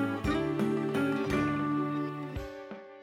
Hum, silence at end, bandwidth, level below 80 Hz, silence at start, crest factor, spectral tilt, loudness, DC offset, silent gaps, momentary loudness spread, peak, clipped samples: none; 0 s; 15 kHz; -50 dBFS; 0 s; 14 dB; -7 dB/octave; -31 LUFS; under 0.1%; none; 12 LU; -18 dBFS; under 0.1%